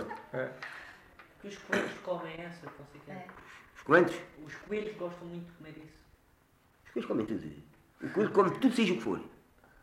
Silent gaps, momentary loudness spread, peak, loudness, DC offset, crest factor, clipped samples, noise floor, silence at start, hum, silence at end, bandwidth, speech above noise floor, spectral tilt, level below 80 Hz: none; 24 LU; -10 dBFS; -32 LUFS; under 0.1%; 24 dB; under 0.1%; -66 dBFS; 0 s; none; 0.45 s; 15.5 kHz; 33 dB; -6 dB/octave; -68 dBFS